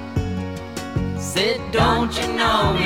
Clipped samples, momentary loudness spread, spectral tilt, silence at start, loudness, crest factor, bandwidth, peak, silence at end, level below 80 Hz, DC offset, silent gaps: under 0.1%; 10 LU; -4.5 dB/octave; 0 s; -21 LUFS; 18 dB; 17.5 kHz; -2 dBFS; 0 s; -34 dBFS; 0.4%; none